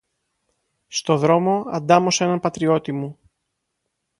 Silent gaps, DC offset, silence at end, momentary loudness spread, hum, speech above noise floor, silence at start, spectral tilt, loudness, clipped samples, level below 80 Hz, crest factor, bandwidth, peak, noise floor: none; under 0.1%; 1.05 s; 12 LU; none; 58 dB; 0.9 s; -5 dB/octave; -20 LUFS; under 0.1%; -62 dBFS; 20 dB; 11.5 kHz; 0 dBFS; -77 dBFS